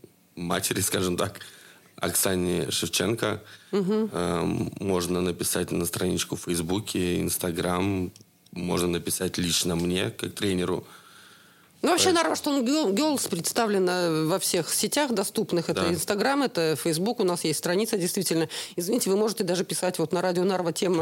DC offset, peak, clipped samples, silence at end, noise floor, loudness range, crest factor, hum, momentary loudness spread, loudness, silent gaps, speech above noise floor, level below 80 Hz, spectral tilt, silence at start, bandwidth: under 0.1%; -6 dBFS; under 0.1%; 0 s; -55 dBFS; 3 LU; 20 dB; none; 6 LU; -26 LUFS; none; 29 dB; -64 dBFS; -4 dB/octave; 0.35 s; 17 kHz